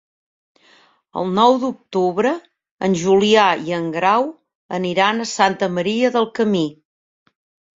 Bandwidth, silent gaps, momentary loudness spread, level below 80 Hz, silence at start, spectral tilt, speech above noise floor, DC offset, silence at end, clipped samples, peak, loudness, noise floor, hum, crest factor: 7.8 kHz; 2.71-2.77 s, 4.55-4.69 s; 11 LU; -62 dBFS; 1.15 s; -5 dB/octave; 37 dB; under 0.1%; 1.05 s; under 0.1%; -2 dBFS; -18 LUFS; -54 dBFS; none; 18 dB